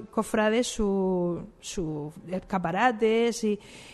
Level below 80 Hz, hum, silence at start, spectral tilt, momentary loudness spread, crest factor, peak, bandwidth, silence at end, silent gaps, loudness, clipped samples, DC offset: -50 dBFS; none; 0 s; -5 dB/octave; 12 LU; 16 dB; -10 dBFS; 12 kHz; 0 s; none; -27 LUFS; under 0.1%; under 0.1%